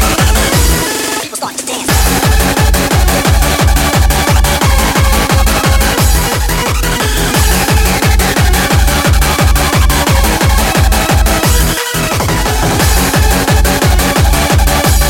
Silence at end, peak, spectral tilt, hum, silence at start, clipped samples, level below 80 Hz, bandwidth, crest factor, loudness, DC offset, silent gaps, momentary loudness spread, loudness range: 0 s; 0 dBFS; -4 dB/octave; none; 0 s; under 0.1%; -12 dBFS; 17.5 kHz; 10 dB; -10 LUFS; under 0.1%; none; 3 LU; 1 LU